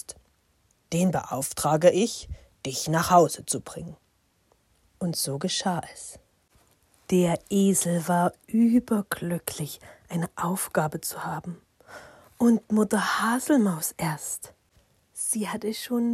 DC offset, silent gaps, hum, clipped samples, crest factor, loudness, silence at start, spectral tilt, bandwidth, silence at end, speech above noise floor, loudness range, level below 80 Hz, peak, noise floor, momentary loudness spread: under 0.1%; none; none; under 0.1%; 22 dB; -25 LUFS; 0.1 s; -5 dB/octave; 16 kHz; 0 s; 42 dB; 6 LU; -56 dBFS; -6 dBFS; -67 dBFS; 19 LU